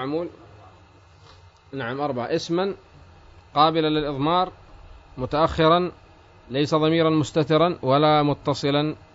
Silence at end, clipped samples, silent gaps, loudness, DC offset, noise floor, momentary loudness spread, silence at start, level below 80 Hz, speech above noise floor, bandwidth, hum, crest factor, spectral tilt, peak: 0.15 s; under 0.1%; none; -22 LUFS; under 0.1%; -51 dBFS; 12 LU; 0 s; -50 dBFS; 30 dB; 8 kHz; none; 20 dB; -6.5 dB/octave; -4 dBFS